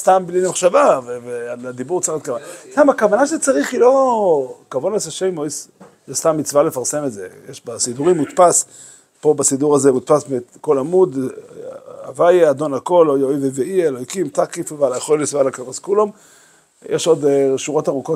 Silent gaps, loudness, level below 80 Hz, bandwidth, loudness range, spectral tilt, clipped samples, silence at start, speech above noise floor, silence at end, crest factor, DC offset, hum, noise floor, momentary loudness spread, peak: none; -17 LUFS; -66 dBFS; 16 kHz; 4 LU; -4.5 dB/octave; under 0.1%; 0 s; 34 dB; 0 s; 16 dB; under 0.1%; none; -51 dBFS; 14 LU; 0 dBFS